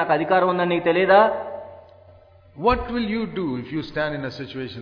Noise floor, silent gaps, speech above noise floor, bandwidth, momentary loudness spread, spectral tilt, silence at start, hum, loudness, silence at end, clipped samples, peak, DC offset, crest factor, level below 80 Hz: -50 dBFS; none; 29 dB; 5.4 kHz; 16 LU; -8 dB/octave; 0 s; none; -21 LUFS; 0 s; under 0.1%; -4 dBFS; under 0.1%; 18 dB; -44 dBFS